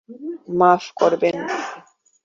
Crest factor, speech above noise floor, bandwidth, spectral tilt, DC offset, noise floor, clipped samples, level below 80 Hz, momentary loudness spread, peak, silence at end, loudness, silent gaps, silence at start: 18 dB; 27 dB; 7.6 kHz; -5.5 dB/octave; under 0.1%; -47 dBFS; under 0.1%; -66 dBFS; 17 LU; -2 dBFS; 0.45 s; -19 LUFS; none; 0.1 s